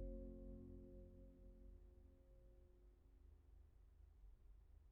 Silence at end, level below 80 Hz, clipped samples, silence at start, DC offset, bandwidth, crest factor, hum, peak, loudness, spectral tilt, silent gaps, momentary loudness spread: 0 s; -62 dBFS; under 0.1%; 0 s; under 0.1%; 2.6 kHz; 18 dB; none; -42 dBFS; -62 LUFS; -11 dB/octave; none; 13 LU